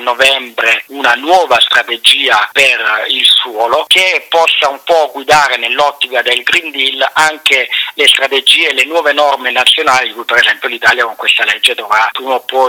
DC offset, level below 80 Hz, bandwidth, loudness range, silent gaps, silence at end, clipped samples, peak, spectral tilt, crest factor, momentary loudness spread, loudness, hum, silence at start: under 0.1%; -54 dBFS; over 20 kHz; 2 LU; none; 0 s; 0.2%; 0 dBFS; 0 dB/octave; 10 dB; 5 LU; -9 LUFS; none; 0 s